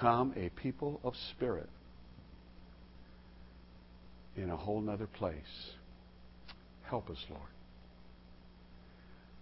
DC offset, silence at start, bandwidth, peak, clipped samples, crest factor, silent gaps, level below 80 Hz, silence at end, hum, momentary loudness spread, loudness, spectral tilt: under 0.1%; 0 s; 5.6 kHz; -16 dBFS; under 0.1%; 26 dB; none; -56 dBFS; 0 s; 60 Hz at -60 dBFS; 22 LU; -40 LUFS; -5.5 dB/octave